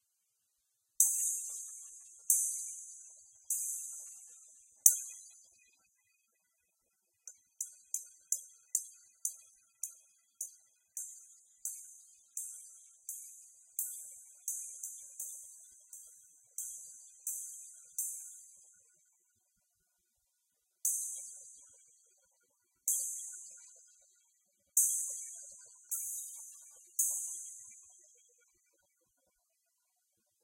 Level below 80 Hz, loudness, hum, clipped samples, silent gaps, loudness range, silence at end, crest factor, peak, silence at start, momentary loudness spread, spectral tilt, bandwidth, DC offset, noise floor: under -90 dBFS; -36 LUFS; none; under 0.1%; none; 11 LU; 2.45 s; 40 dB; -2 dBFS; 1 s; 24 LU; 4.5 dB/octave; 16 kHz; under 0.1%; -81 dBFS